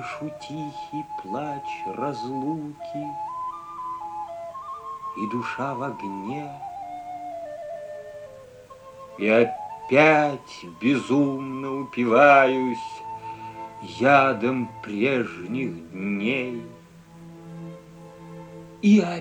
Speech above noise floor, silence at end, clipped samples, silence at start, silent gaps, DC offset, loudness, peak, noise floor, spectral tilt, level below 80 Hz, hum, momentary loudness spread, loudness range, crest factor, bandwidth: 24 dB; 0 s; under 0.1%; 0 s; none; under 0.1%; -24 LUFS; -4 dBFS; -47 dBFS; -6.5 dB/octave; -64 dBFS; none; 22 LU; 12 LU; 22 dB; 9.8 kHz